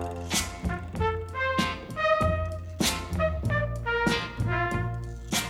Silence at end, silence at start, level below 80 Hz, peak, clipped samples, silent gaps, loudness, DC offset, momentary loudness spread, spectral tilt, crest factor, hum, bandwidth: 0 s; 0 s; -40 dBFS; -12 dBFS; under 0.1%; none; -28 LUFS; under 0.1%; 7 LU; -4 dB/octave; 16 dB; none; 16.5 kHz